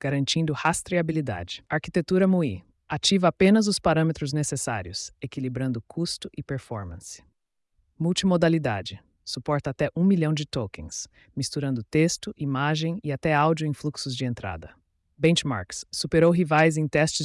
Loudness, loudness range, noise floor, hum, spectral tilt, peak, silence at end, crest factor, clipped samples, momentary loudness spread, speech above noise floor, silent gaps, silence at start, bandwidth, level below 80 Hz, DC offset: -25 LUFS; 6 LU; -74 dBFS; none; -5 dB/octave; -8 dBFS; 0 s; 16 dB; under 0.1%; 14 LU; 49 dB; none; 0.05 s; 12 kHz; -54 dBFS; under 0.1%